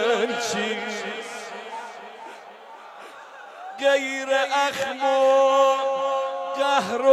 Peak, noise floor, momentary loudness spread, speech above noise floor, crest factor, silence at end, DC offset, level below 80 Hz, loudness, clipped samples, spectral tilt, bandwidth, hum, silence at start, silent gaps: -6 dBFS; -43 dBFS; 23 LU; 23 dB; 18 dB; 0 s; under 0.1%; -78 dBFS; -22 LUFS; under 0.1%; -2.5 dB/octave; 13.5 kHz; none; 0 s; none